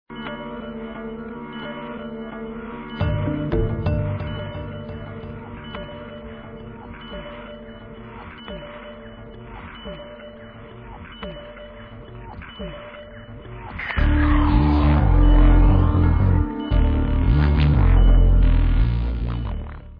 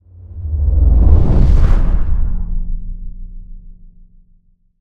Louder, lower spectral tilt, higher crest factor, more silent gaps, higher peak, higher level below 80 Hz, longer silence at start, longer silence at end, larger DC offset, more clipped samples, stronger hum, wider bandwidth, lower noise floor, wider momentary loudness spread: second, -21 LUFS vs -16 LUFS; about the same, -10.5 dB/octave vs -10 dB/octave; about the same, 16 dB vs 12 dB; neither; second, -4 dBFS vs 0 dBFS; second, -22 dBFS vs -14 dBFS; second, 0.1 s vs 0.25 s; second, 0 s vs 1.05 s; neither; neither; neither; first, 4.9 kHz vs 3.5 kHz; second, -40 dBFS vs -51 dBFS; about the same, 22 LU vs 22 LU